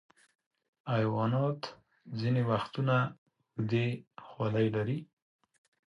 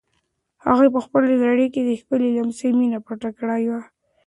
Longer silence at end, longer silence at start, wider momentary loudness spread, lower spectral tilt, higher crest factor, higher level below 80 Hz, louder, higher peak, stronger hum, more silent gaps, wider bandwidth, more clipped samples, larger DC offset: first, 0.9 s vs 0.45 s; first, 0.85 s vs 0.65 s; first, 14 LU vs 11 LU; first, -8.5 dB/octave vs -6.5 dB/octave; about the same, 16 dB vs 18 dB; second, -70 dBFS vs -60 dBFS; second, -32 LUFS vs -20 LUFS; second, -16 dBFS vs -2 dBFS; neither; first, 3.18-3.26 s, 4.07-4.11 s vs none; second, 6.6 kHz vs 11 kHz; neither; neither